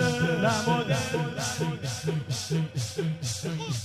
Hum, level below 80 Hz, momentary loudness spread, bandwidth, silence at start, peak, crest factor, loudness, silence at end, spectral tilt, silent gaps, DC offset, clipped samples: none; -56 dBFS; 6 LU; 14.5 kHz; 0 s; -12 dBFS; 16 dB; -28 LUFS; 0 s; -4.5 dB/octave; none; under 0.1%; under 0.1%